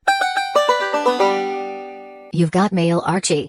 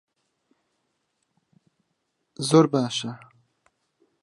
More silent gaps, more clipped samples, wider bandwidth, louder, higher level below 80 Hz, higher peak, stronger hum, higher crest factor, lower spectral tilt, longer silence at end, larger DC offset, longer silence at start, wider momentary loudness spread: neither; neither; first, 15 kHz vs 11.5 kHz; first, -18 LUFS vs -22 LUFS; first, -60 dBFS vs -74 dBFS; about the same, -2 dBFS vs -4 dBFS; neither; second, 16 dB vs 24 dB; about the same, -4.5 dB/octave vs -5.5 dB/octave; second, 0 s vs 1.05 s; neither; second, 0.05 s vs 2.4 s; second, 13 LU vs 18 LU